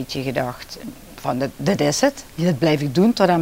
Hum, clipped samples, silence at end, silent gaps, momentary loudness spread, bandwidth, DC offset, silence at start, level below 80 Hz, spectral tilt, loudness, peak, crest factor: none; under 0.1%; 0 s; none; 17 LU; 16 kHz; under 0.1%; 0 s; -48 dBFS; -5.5 dB/octave; -20 LUFS; -2 dBFS; 18 dB